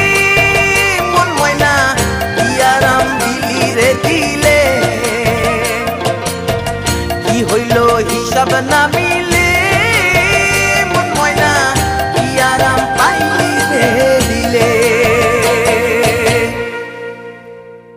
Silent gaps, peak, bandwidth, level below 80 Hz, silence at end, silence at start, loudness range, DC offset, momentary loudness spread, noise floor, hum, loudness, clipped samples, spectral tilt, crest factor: none; 0 dBFS; 16 kHz; -30 dBFS; 0 s; 0 s; 3 LU; under 0.1%; 7 LU; -33 dBFS; none; -11 LUFS; under 0.1%; -3.5 dB/octave; 12 dB